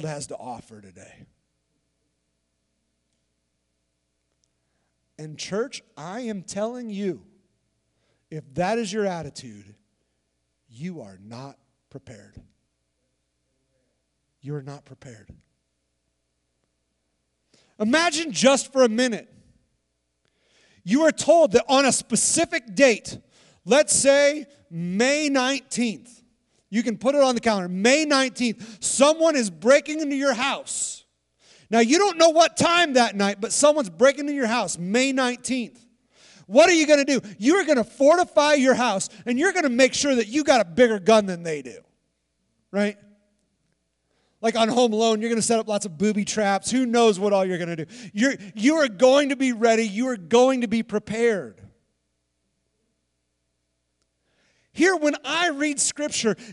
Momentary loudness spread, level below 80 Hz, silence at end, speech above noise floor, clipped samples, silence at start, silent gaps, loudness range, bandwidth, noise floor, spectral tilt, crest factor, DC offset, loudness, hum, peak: 17 LU; -64 dBFS; 0 s; 54 dB; under 0.1%; 0 s; none; 19 LU; 12 kHz; -75 dBFS; -3 dB/octave; 20 dB; under 0.1%; -21 LUFS; none; -4 dBFS